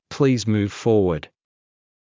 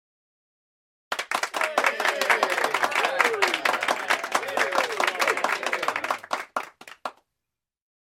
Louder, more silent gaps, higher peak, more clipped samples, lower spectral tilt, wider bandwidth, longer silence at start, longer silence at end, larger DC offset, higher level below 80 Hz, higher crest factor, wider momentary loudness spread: first, -21 LUFS vs -24 LUFS; neither; about the same, -6 dBFS vs -4 dBFS; neither; first, -6.5 dB/octave vs -0.5 dB/octave; second, 7.6 kHz vs 16.5 kHz; second, 0.1 s vs 1.1 s; about the same, 0.95 s vs 1 s; neither; first, -46 dBFS vs -76 dBFS; second, 16 dB vs 22 dB; second, 5 LU vs 12 LU